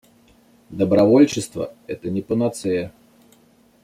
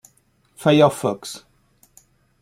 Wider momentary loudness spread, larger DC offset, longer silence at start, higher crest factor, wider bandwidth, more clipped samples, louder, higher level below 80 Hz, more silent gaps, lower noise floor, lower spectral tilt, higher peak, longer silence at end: second, 16 LU vs 20 LU; neither; about the same, 0.7 s vs 0.6 s; about the same, 18 dB vs 20 dB; second, 14.5 kHz vs 16 kHz; neither; about the same, -20 LUFS vs -19 LUFS; about the same, -58 dBFS vs -62 dBFS; neither; second, -55 dBFS vs -61 dBFS; about the same, -6.5 dB/octave vs -5.5 dB/octave; about the same, -2 dBFS vs -2 dBFS; about the same, 0.95 s vs 1.05 s